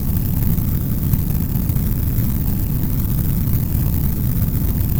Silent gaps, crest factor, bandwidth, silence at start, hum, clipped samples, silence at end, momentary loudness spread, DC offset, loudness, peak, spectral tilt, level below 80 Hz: none; 16 dB; over 20 kHz; 0 s; none; under 0.1%; 0 s; 1 LU; under 0.1%; -20 LUFS; 0 dBFS; -7.5 dB/octave; -22 dBFS